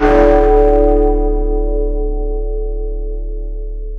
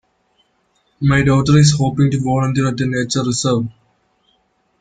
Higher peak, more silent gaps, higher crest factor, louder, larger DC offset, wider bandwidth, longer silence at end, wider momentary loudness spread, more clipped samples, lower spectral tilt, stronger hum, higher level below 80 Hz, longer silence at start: about the same, 0 dBFS vs -2 dBFS; neither; about the same, 12 dB vs 16 dB; about the same, -15 LUFS vs -15 LUFS; neither; second, 4.4 kHz vs 9.4 kHz; second, 0 s vs 1.1 s; first, 16 LU vs 8 LU; neither; first, -9 dB/octave vs -5.5 dB/octave; neither; first, -16 dBFS vs -42 dBFS; second, 0 s vs 1 s